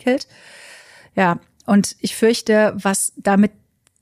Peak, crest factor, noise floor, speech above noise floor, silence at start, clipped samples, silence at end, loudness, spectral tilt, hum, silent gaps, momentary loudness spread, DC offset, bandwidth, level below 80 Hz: -4 dBFS; 16 dB; -44 dBFS; 27 dB; 0.05 s; under 0.1%; 0.55 s; -18 LUFS; -4.5 dB/octave; none; none; 8 LU; under 0.1%; 15.5 kHz; -58 dBFS